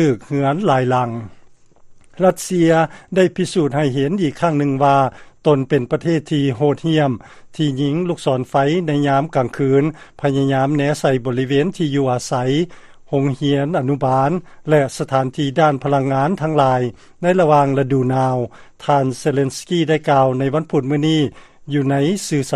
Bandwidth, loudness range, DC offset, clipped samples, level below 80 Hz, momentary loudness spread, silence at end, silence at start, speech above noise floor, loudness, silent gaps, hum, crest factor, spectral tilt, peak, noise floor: 13 kHz; 2 LU; under 0.1%; under 0.1%; -52 dBFS; 6 LU; 0 s; 0 s; 28 dB; -17 LUFS; none; none; 16 dB; -6.5 dB/octave; 0 dBFS; -44 dBFS